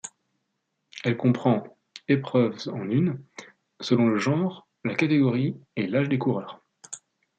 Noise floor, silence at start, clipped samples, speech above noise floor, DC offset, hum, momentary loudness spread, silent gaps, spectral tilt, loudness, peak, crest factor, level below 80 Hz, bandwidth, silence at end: -78 dBFS; 0.05 s; under 0.1%; 54 dB; under 0.1%; none; 19 LU; none; -7 dB/octave; -25 LUFS; -8 dBFS; 18 dB; -70 dBFS; 9.2 kHz; 0.4 s